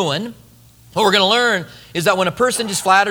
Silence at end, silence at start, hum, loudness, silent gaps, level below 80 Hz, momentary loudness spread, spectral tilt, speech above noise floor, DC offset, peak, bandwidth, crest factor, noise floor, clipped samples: 0 s; 0 s; none; -16 LUFS; none; -54 dBFS; 13 LU; -3 dB/octave; 30 dB; under 0.1%; 0 dBFS; over 20 kHz; 18 dB; -47 dBFS; under 0.1%